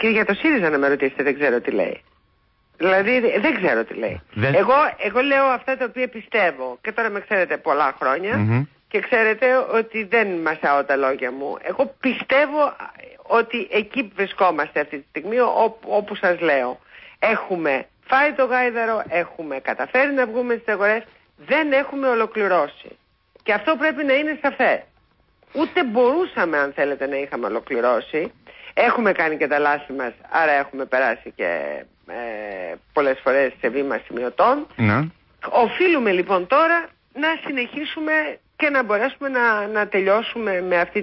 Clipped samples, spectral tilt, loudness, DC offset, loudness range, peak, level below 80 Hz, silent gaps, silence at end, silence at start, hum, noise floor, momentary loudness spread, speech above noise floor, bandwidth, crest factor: under 0.1%; -10.5 dB/octave; -20 LUFS; under 0.1%; 2 LU; -6 dBFS; -58 dBFS; none; 0 s; 0 s; none; -62 dBFS; 9 LU; 42 dB; 5.8 kHz; 14 dB